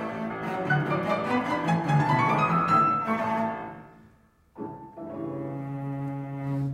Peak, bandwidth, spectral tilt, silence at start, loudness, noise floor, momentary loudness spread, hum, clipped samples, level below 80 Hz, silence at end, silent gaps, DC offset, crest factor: -10 dBFS; 12.5 kHz; -7.5 dB/octave; 0 s; -26 LUFS; -59 dBFS; 17 LU; none; under 0.1%; -60 dBFS; 0 s; none; under 0.1%; 18 dB